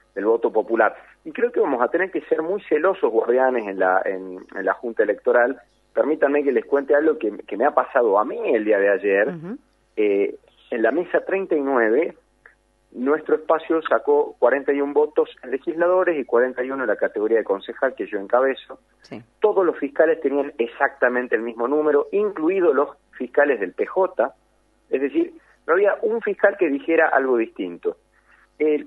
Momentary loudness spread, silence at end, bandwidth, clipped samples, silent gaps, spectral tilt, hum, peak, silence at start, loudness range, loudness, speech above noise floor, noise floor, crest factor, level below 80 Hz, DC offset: 9 LU; 0 s; 4.1 kHz; under 0.1%; none; -7.5 dB/octave; none; -2 dBFS; 0.15 s; 2 LU; -21 LUFS; 42 dB; -62 dBFS; 20 dB; -66 dBFS; under 0.1%